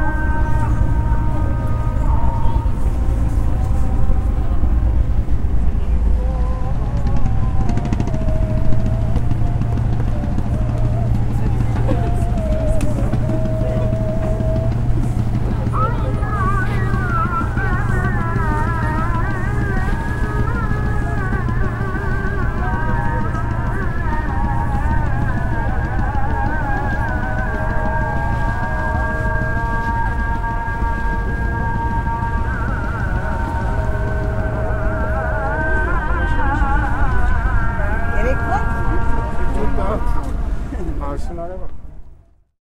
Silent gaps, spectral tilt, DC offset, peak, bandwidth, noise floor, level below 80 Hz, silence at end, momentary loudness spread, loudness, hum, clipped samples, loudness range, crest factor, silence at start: none; -8 dB/octave; under 0.1%; -2 dBFS; 10.5 kHz; -45 dBFS; -20 dBFS; 0.45 s; 3 LU; -20 LUFS; none; under 0.1%; 2 LU; 14 dB; 0 s